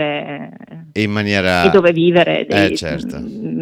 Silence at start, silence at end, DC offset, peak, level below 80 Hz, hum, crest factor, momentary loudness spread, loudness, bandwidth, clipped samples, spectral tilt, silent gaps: 0 s; 0 s; under 0.1%; 0 dBFS; -46 dBFS; none; 16 dB; 15 LU; -15 LUFS; 14.5 kHz; under 0.1%; -6 dB/octave; none